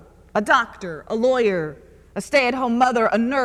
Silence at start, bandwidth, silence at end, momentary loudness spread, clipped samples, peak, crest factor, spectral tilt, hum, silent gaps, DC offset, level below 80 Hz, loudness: 0.35 s; 13 kHz; 0 s; 14 LU; under 0.1%; -2 dBFS; 18 dB; -4.5 dB/octave; none; none; under 0.1%; -52 dBFS; -20 LUFS